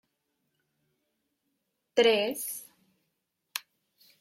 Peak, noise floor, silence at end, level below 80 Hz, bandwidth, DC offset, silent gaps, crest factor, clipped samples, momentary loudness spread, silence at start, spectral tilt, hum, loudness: -10 dBFS; -81 dBFS; 0.6 s; -84 dBFS; 16.5 kHz; under 0.1%; none; 22 dB; under 0.1%; 16 LU; 1.95 s; -2 dB/octave; none; -28 LUFS